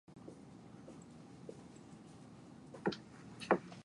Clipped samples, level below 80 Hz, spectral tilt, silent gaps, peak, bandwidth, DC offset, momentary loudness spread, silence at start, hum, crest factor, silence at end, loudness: under 0.1%; -74 dBFS; -6 dB/octave; none; -16 dBFS; 11 kHz; under 0.1%; 20 LU; 0.1 s; none; 30 dB; 0 s; -43 LUFS